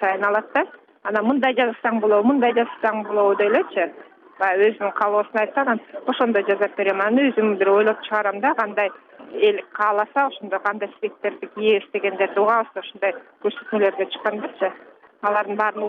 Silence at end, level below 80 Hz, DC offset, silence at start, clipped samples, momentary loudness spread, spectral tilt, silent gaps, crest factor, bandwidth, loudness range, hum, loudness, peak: 0 s; -76 dBFS; under 0.1%; 0 s; under 0.1%; 9 LU; -7 dB/octave; none; 14 dB; 4.7 kHz; 3 LU; none; -21 LUFS; -6 dBFS